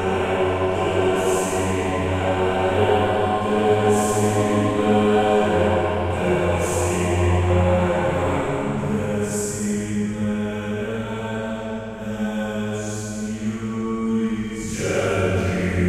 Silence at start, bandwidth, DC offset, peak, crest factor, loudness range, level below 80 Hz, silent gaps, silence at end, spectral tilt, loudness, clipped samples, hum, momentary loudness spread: 0 s; 15 kHz; under 0.1%; -6 dBFS; 16 dB; 7 LU; -42 dBFS; none; 0 s; -6 dB/octave; -22 LUFS; under 0.1%; none; 9 LU